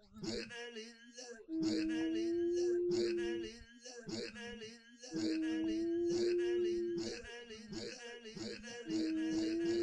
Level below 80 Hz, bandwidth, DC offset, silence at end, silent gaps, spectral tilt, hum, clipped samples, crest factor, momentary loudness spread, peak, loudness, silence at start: -66 dBFS; 9.8 kHz; under 0.1%; 0 s; none; -4.5 dB/octave; none; under 0.1%; 14 dB; 15 LU; -26 dBFS; -39 LUFS; 0.1 s